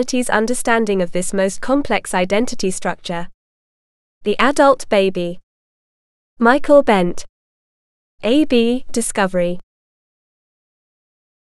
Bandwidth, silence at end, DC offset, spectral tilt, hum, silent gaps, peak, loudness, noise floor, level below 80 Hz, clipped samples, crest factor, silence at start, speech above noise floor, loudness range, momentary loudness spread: 13.5 kHz; 1.9 s; under 0.1%; -4.5 dB/octave; none; 3.34-4.21 s, 5.43-6.37 s, 7.29-8.18 s; 0 dBFS; -17 LUFS; under -90 dBFS; -42 dBFS; under 0.1%; 18 dB; 0 s; over 74 dB; 4 LU; 13 LU